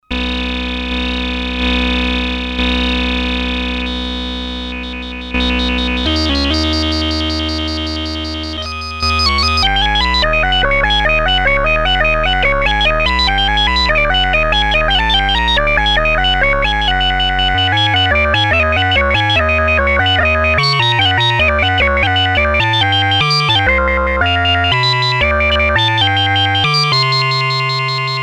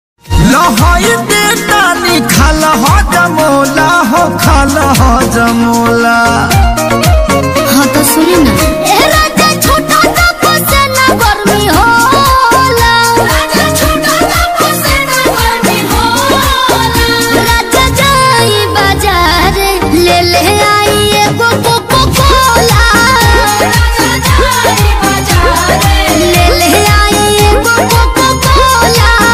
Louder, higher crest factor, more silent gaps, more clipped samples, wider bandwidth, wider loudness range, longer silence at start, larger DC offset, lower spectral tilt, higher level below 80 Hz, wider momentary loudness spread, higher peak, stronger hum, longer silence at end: second, -13 LUFS vs -7 LUFS; first, 14 dB vs 8 dB; neither; second, under 0.1% vs 0.3%; second, 12 kHz vs 16.5 kHz; first, 5 LU vs 1 LU; second, 0.1 s vs 0.25 s; neither; about the same, -4.5 dB/octave vs -4 dB/octave; second, -22 dBFS vs -16 dBFS; first, 7 LU vs 3 LU; about the same, 0 dBFS vs 0 dBFS; neither; about the same, 0 s vs 0 s